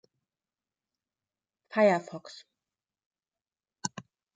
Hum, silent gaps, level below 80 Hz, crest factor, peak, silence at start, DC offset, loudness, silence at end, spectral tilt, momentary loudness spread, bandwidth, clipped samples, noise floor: none; 3.06-3.11 s; -84 dBFS; 24 dB; -10 dBFS; 1.75 s; under 0.1%; -29 LUFS; 0.5 s; -4.5 dB/octave; 24 LU; 9.2 kHz; under 0.1%; under -90 dBFS